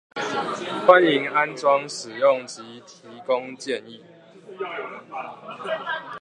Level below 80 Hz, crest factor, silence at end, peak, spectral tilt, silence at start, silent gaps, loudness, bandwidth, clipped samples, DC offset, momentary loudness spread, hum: -76 dBFS; 24 dB; 0 s; 0 dBFS; -4 dB/octave; 0.15 s; none; -22 LUFS; 10.5 kHz; under 0.1%; under 0.1%; 20 LU; none